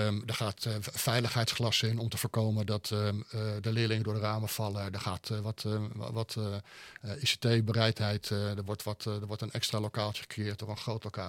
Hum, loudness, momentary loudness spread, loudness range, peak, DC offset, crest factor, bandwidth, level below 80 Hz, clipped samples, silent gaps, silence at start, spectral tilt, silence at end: none; -33 LUFS; 9 LU; 4 LU; -10 dBFS; under 0.1%; 24 dB; 16.5 kHz; -68 dBFS; under 0.1%; none; 0 s; -5 dB/octave; 0 s